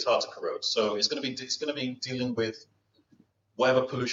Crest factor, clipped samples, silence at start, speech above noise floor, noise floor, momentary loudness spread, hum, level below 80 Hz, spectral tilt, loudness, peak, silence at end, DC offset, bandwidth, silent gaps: 20 dB; under 0.1%; 0 s; 36 dB; -64 dBFS; 8 LU; none; -74 dBFS; -3.5 dB/octave; -29 LUFS; -10 dBFS; 0 s; under 0.1%; 7.8 kHz; none